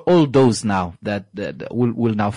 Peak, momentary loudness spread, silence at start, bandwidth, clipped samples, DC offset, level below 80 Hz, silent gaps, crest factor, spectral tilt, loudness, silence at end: -6 dBFS; 12 LU; 0 s; 11 kHz; under 0.1%; under 0.1%; -54 dBFS; none; 12 dB; -6.5 dB/octave; -19 LUFS; 0 s